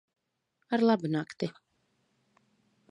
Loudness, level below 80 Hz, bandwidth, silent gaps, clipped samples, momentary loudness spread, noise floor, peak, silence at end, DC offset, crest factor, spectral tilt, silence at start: -30 LUFS; -80 dBFS; 9.8 kHz; none; under 0.1%; 11 LU; -79 dBFS; -12 dBFS; 1.4 s; under 0.1%; 20 dB; -7 dB/octave; 0.7 s